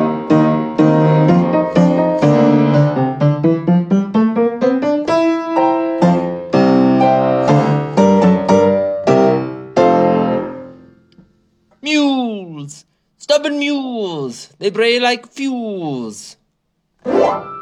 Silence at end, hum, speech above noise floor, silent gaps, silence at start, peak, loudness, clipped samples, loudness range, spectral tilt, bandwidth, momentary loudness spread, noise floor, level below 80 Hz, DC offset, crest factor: 0 s; none; 50 dB; none; 0 s; 0 dBFS; -14 LUFS; under 0.1%; 7 LU; -7 dB/octave; 11 kHz; 11 LU; -67 dBFS; -56 dBFS; under 0.1%; 14 dB